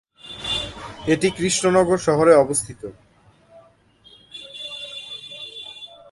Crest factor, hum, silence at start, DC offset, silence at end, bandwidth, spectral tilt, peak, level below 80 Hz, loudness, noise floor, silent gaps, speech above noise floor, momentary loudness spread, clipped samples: 22 dB; none; 0.25 s; under 0.1%; 0.25 s; 12 kHz; -4 dB/octave; -2 dBFS; -52 dBFS; -20 LUFS; -54 dBFS; none; 36 dB; 22 LU; under 0.1%